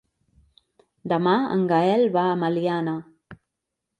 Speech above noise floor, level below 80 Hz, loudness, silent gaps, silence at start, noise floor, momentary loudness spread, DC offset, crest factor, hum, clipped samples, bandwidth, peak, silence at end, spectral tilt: 61 dB; -68 dBFS; -22 LUFS; none; 1.05 s; -83 dBFS; 9 LU; under 0.1%; 18 dB; none; under 0.1%; 9 kHz; -6 dBFS; 0.65 s; -8 dB/octave